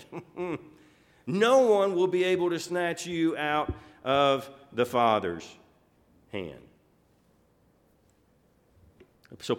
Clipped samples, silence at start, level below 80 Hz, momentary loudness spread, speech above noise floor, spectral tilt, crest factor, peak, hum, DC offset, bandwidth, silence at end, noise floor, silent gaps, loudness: under 0.1%; 0 s; -58 dBFS; 18 LU; 38 dB; -5 dB/octave; 18 dB; -10 dBFS; none; under 0.1%; 16 kHz; 0 s; -65 dBFS; none; -27 LUFS